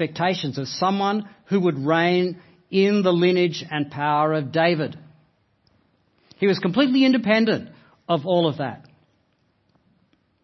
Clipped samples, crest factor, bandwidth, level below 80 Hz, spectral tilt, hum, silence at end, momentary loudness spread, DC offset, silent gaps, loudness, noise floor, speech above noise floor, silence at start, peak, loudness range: under 0.1%; 18 dB; 6.2 kHz; -68 dBFS; -6.5 dB/octave; none; 1.65 s; 9 LU; under 0.1%; none; -21 LUFS; -66 dBFS; 45 dB; 0 s; -4 dBFS; 3 LU